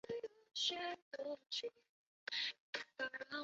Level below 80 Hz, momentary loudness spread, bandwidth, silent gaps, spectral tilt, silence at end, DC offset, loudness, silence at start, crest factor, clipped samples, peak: -88 dBFS; 9 LU; 7.6 kHz; 1.02-1.11 s, 1.89-2.27 s, 2.60-2.73 s; 1.5 dB/octave; 0 s; under 0.1%; -44 LUFS; 0.05 s; 20 dB; under 0.1%; -26 dBFS